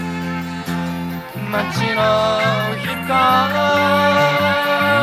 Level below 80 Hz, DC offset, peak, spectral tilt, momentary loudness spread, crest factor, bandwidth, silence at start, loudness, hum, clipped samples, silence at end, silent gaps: -50 dBFS; under 0.1%; -2 dBFS; -5 dB/octave; 10 LU; 14 dB; 16 kHz; 0 s; -17 LUFS; none; under 0.1%; 0 s; none